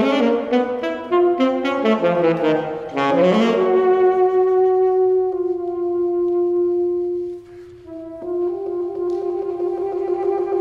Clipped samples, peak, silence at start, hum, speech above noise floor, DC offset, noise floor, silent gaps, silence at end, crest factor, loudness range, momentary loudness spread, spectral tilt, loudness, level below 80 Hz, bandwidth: under 0.1%; -4 dBFS; 0 s; none; 23 dB; under 0.1%; -39 dBFS; none; 0 s; 14 dB; 7 LU; 9 LU; -7 dB/octave; -19 LUFS; -58 dBFS; 7.4 kHz